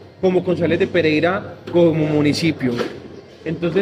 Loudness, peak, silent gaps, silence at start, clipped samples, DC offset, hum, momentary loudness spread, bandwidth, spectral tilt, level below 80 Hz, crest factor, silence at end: -18 LUFS; -4 dBFS; none; 0 s; under 0.1%; under 0.1%; none; 12 LU; 15 kHz; -6.5 dB/octave; -52 dBFS; 14 dB; 0 s